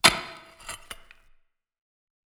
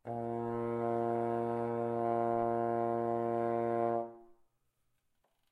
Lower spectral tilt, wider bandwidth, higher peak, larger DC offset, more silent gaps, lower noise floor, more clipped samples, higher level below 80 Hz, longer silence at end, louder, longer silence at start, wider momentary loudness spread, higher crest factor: second, -1 dB/octave vs -9.5 dB/octave; first, over 20 kHz vs 9.6 kHz; first, -2 dBFS vs -20 dBFS; neither; neither; second, -62 dBFS vs -78 dBFS; neither; first, -54 dBFS vs -72 dBFS; first, 1.35 s vs 1.2 s; first, -28 LUFS vs -34 LUFS; about the same, 0.05 s vs 0.05 s; first, 18 LU vs 5 LU; first, 28 dB vs 16 dB